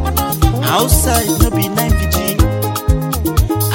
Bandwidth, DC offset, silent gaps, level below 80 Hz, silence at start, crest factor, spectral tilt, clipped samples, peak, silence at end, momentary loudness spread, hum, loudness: 17 kHz; under 0.1%; none; -18 dBFS; 0 s; 14 dB; -5 dB/octave; under 0.1%; 0 dBFS; 0 s; 4 LU; none; -14 LUFS